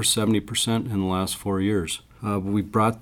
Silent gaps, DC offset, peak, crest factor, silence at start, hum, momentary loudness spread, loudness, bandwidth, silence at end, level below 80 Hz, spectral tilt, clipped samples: none; under 0.1%; -8 dBFS; 16 dB; 0 s; none; 6 LU; -24 LUFS; 19 kHz; 0 s; -50 dBFS; -4.5 dB/octave; under 0.1%